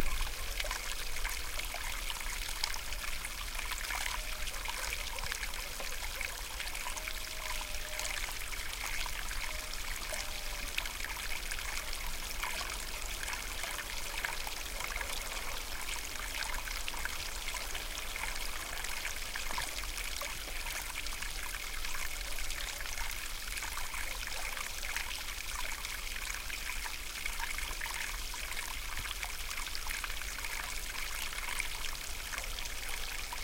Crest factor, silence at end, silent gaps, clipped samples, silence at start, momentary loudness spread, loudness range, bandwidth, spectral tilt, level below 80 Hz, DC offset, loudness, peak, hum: 24 dB; 0 s; none; under 0.1%; 0 s; 2 LU; 1 LU; 17 kHz; -0.5 dB/octave; -42 dBFS; under 0.1%; -38 LUFS; -14 dBFS; none